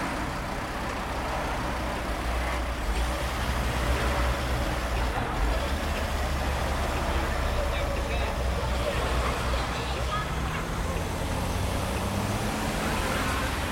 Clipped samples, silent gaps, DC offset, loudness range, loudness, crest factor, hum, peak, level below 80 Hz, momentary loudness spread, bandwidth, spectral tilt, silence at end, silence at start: under 0.1%; none; under 0.1%; 1 LU; -29 LUFS; 14 dB; none; -14 dBFS; -32 dBFS; 3 LU; 16.5 kHz; -5 dB/octave; 0 s; 0 s